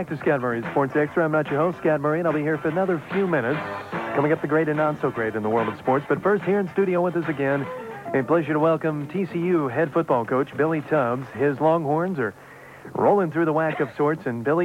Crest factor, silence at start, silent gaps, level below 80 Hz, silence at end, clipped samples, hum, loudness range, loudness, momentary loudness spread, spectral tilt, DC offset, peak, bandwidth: 16 dB; 0 s; none; -64 dBFS; 0 s; under 0.1%; none; 1 LU; -23 LUFS; 6 LU; -8.5 dB/octave; under 0.1%; -8 dBFS; 15.5 kHz